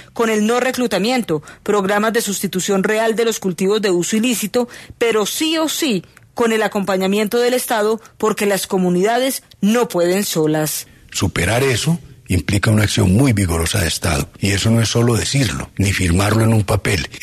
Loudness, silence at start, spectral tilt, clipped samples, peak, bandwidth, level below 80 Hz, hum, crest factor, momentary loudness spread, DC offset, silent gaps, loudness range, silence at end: -17 LUFS; 0.15 s; -4.5 dB/octave; under 0.1%; -2 dBFS; 14 kHz; -38 dBFS; none; 16 dB; 5 LU; under 0.1%; none; 2 LU; 0.05 s